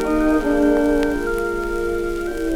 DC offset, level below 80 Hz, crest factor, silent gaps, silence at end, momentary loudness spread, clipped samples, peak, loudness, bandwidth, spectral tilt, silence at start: under 0.1%; -32 dBFS; 12 dB; none; 0 s; 7 LU; under 0.1%; -6 dBFS; -20 LUFS; 16 kHz; -6 dB/octave; 0 s